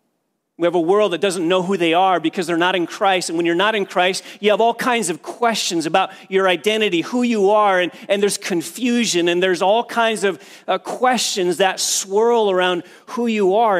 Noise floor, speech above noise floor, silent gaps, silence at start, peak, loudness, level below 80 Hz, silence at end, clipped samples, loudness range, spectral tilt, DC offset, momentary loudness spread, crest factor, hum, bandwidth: -71 dBFS; 54 dB; none; 0.6 s; -2 dBFS; -18 LUFS; -76 dBFS; 0 s; under 0.1%; 1 LU; -3 dB/octave; under 0.1%; 6 LU; 16 dB; none; 16 kHz